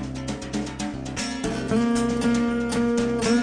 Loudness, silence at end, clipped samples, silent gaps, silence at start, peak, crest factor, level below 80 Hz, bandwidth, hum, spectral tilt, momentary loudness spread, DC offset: -25 LUFS; 0 s; under 0.1%; none; 0 s; -10 dBFS; 14 dB; -42 dBFS; 10 kHz; none; -5 dB/octave; 8 LU; under 0.1%